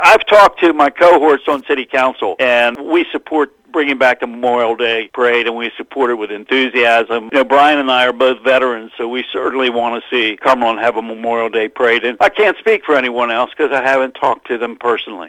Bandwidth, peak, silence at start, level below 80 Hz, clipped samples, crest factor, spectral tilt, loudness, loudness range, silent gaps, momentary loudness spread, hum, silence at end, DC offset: 16 kHz; 0 dBFS; 0 s; -54 dBFS; 0.2%; 14 dB; -3.5 dB/octave; -13 LUFS; 2 LU; none; 9 LU; none; 0 s; under 0.1%